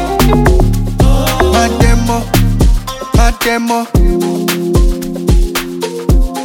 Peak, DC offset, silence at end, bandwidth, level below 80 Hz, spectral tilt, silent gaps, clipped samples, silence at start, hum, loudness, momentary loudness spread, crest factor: 0 dBFS; under 0.1%; 0 s; 19 kHz; -14 dBFS; -5.5 dB/octave; none; under 0.1%; 0 s; none; -12 LUFS; 6 LU; 10 dB